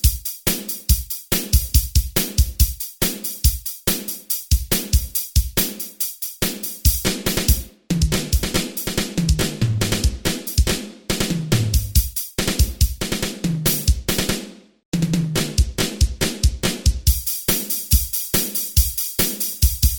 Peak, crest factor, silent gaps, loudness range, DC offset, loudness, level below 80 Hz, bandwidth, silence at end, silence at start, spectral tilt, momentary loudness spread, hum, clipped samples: -2 dBFS; 18 dB; 14.85-14.92 s; 2 LU; under 0.1%; -20 LUFS; -24 dBFS; over 20 kHz; 0 s; 0.05 s; -3.5 dB/octave; 5 LU; none; under 0.1%